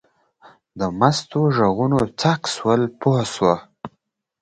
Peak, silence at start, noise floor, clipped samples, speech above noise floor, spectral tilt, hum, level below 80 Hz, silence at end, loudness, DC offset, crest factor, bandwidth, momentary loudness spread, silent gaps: 0 dBFS; 0.75 s; -70 dBFS; under 0.1%; 51 dB; -6 dB/octave; none; -52 dBFS; 0.55 s; -20 LUFS; under 0.1%; 20 dB; 9.8 kHz; 9 LU; none